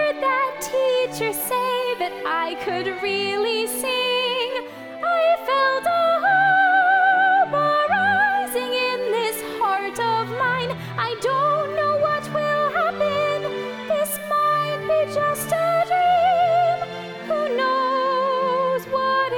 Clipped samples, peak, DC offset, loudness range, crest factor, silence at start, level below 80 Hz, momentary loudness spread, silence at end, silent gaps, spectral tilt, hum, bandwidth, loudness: under 0.1%; -8 dBFS; under 0.1%; 5 LU; 12 dB; 0 s; -64 dBFS; 8 LU; 0 s; none; -3 dB/octave; none; over 20 kHz; -21 LUFS